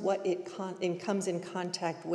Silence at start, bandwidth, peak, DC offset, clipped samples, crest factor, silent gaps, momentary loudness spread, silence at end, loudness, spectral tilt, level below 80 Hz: 0 s; 12 kHz; -18 dBFS; under 0.1%; under 0.1%; 16 dB; none; 4 LU; 0 s; -34 LUFS; -5 dB/octave; -90 dBFS